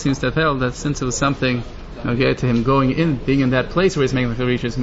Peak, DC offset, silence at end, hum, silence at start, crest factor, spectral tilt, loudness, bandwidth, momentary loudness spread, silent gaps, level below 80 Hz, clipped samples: -4 dBFS; under 0.1%; 0 s; none; 0 s; 14 dB; -6 dB/octave; -19 LUFS; 8 kHz; 6 LU; none; -34 dBFS; under 0.1%